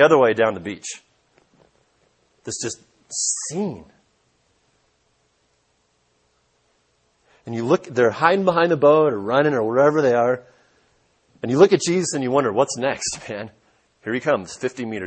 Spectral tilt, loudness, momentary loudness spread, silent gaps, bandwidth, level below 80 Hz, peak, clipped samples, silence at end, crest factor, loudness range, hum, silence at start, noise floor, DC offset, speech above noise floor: -4.5 dB/octave; -20 LUFS; 17 LU; none; 8.8 kHz; -64 dBFS; 0 dBFS; under 0.1%; 0 s; 20 dB; 11 LU; none; 0 s; -66 dBFS; under 0.1%; 47 dB